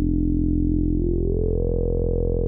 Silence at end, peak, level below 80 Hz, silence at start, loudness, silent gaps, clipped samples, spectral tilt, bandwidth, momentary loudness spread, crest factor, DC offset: 0 s; -10 dBFS; -24 dBFS; 0 s; -23 LUFS; none; under 0.1%; -15.5 dB/octave; 1.1 kHz; 2 LU; 10 dB; under 0.1%